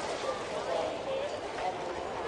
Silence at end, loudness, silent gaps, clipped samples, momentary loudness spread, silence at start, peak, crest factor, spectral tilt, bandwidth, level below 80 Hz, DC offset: 0 s; -35 LUFS; none; under 0.1%; 3 LU; 0 s; -20 dBFS; 14 dB; -3.5 dB/octave; 11.5 kHz; -60 dBFS; under 0.1%